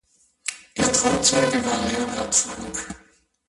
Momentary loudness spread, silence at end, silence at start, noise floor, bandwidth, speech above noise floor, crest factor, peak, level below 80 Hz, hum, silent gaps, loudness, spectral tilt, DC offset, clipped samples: 14 LU; 0.5 s; 0.45 s; -58 dBFS; 11.5 kHz; 35 dB; 22 dB; -2 dBFS; -48 dBFS; none; none; -22 LUFS; -2.5 dB/octave; under 0.1%; under 0.1%